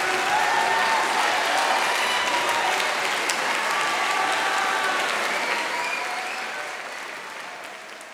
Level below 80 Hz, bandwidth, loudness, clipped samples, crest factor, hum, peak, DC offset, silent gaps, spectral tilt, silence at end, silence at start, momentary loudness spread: -68 dBFS; 18.5 kHz; -22 LUFS; under 0.1%; 20 dB; none; -4 dBFS; under 0.1%; none; 0 dB/octave; 0 s; 0 s; 13 LU